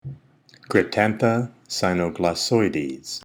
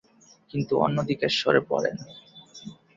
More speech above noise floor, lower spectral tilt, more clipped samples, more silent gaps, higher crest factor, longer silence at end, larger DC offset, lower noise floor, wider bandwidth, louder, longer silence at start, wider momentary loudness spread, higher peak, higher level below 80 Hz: first, 31 dB vs 20 dB; about the same, -5 dB/octave vs -5.5 dB/octave; neither; neither; about the same, 20 dB vs 22 dB; second, 0.05 s vs 0.25 s; neither; first, -53 dBFS vs -45 dBFS; first, over 20 kHz vs 7.8 kHz; first, -22 LUFS vs -25 LUFS; second, 0.05 s vs 0.55 s; second, 9 LU vs 22 LU; about the same, -4 dBFS vs -6 dBFS; first, -56 dBFS vs -62 dBFS